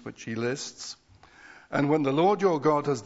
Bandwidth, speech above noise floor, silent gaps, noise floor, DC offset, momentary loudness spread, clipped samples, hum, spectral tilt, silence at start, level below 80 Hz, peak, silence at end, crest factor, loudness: 8 kHz; 28 dB; none; -54 dBFS; under 0.1%; 16 LU; under 0.1%; none; -5.5 dB/octave; 0.05 s; -68 dBFS; -10 dBFS; 0 s; 18 dB; -26 LUFS